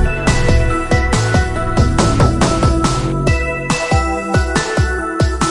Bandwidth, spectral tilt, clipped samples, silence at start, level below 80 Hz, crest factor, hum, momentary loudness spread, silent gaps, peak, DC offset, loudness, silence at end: 11.5 kHz; -5.5 dB/octave; under 0.1%; 0 s; -20 dBFS; 14 dB; none; 4 LU; none; 0 dBFS; under 0.1%; -15 LUFS; 0 s